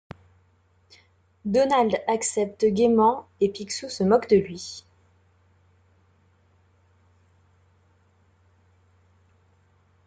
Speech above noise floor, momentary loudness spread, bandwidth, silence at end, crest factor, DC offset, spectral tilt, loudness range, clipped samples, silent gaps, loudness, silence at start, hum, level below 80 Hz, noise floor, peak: 40 dB; 16 LU; 9.4 kHz; 5.25 s; 22 dB; under 0.1%; -5 dB/octave; 6 LU; under 0.1%; none; -23 LUFS; 1.45 s; none; -66 dBFS; -63 dBFS; -6 dBFS